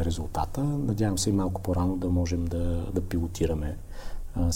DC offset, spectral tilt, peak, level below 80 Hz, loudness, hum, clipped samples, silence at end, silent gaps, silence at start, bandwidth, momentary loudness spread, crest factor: under 0.1%; -6.5 dB/octave; -14 dBFS; -36 dBFS; -29 LUFS; none; under 0.1%; 0 s; none; 0 s; 16.5 kHz; 10 LU; 14 dB